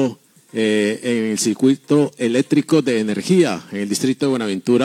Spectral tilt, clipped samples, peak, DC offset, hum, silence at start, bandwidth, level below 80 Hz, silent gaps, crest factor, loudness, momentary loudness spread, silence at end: -5 dB/octave; under 0.1%; -2 dBFS; under 0.1%; none; 0 s; 15.5 kHz; -72 dBFS; none; 16 dB; -18 LUFS; 5 LU; 0 s